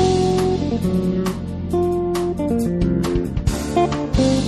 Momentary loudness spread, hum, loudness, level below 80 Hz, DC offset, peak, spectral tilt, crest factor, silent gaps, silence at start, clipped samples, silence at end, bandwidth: 5 LU; none; -20 LUFS; -30 dBFS; under 0.1%; -4 dBFS; -6.5 dB/octave; 16 dB; none; 0 s; under 0.1%; 0 s; 13 kHz